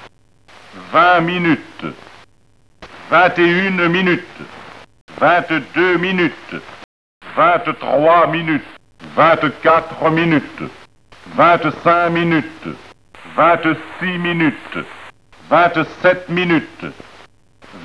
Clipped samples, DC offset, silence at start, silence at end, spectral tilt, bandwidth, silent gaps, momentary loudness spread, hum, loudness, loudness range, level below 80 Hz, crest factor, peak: under 0.1%; 0.4%; 0 s; 0 s; -7 dB/octave; 11 kHz; 5.01-5.08 s, 6.84-7.21 s; 18 LU; none; -15 LUFS; 3 LU; -56 dBFS; 16 dB; 0 dBFS